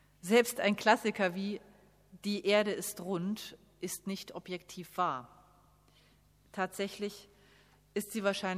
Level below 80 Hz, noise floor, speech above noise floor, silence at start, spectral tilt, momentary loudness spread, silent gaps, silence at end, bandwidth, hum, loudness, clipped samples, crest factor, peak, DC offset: -72 dBFS; -66 dBFS; 32 dB; 0.25 s; -4 dB/octave; 15 LU; none; 0 s; 15.5 kHz; 50 Hz at -70 dBFS; -34 LUFS; under 0.1%; 24 dB; -10 dBFS; under 0.1%